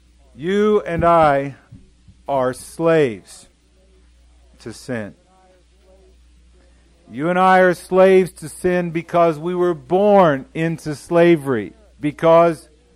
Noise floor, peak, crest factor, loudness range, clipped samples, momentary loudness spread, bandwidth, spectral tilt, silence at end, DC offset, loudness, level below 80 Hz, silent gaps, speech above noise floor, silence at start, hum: -53 dBFS; -4 dBFS; 16 dB; 19 LU; under 0.1%; 17 LU; 14.5 kHz; -6.5 dB/octave; 0.35 s; under 0.1%; -17 LUFS; -48 dBFS; none; 37 dB; 0.4 s; none